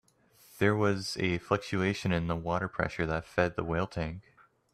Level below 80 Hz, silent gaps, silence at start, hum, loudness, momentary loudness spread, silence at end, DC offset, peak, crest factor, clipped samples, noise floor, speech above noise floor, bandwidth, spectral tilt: -54 dBFS; none; 0.55 s; none; -31 LUFS; 5 LU; 0.55 s; under 0.1%; -10 dBFS; 20 dB; under 0.1%; -62 dBFS; 31 dB; 14 kHz; -6 dB/octave